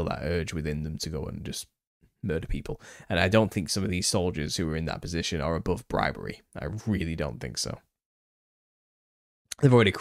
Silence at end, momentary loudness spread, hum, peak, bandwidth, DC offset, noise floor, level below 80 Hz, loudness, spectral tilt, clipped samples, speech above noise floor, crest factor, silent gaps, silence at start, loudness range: 0 s; 15 LU; none; -6 dBFS; 15.5 kHz; under 0.1%; under -90 dBFS; -44 dBFS; -28 LUFS; -5 dB/octave; under 0.1%; over 62 dB; 22 dB; 1.87-2.00 s, 8.06-9.45 s; 0 s; 6 LU